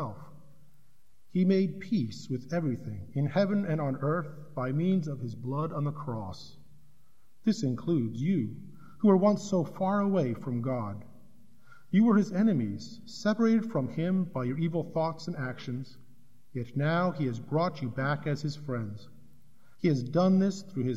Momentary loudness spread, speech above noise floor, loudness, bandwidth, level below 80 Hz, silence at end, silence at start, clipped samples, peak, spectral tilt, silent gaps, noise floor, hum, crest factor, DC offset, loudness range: 13 LU; 39 dB; -30 LUFS; 8 kHz; -68 dBFS; 0 s; 0 s; under 0.1%; -12 dBFS; -8 dB/octave; none; -68 dBFS; none; 18 dB; 0.4%; 5 LU